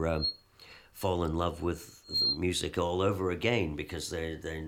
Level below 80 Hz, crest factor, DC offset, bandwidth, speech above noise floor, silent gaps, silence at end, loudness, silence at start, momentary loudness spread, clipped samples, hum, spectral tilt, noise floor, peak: -48 dBFS; 20 dB; under 0.1%; 17.5 kHz; 24 dB; none; 0 s; -31 LUFS; 0 s; 9 LU; under 0.1%; none; -4.5 dB/octave; -55 dBFS; -12 dBFS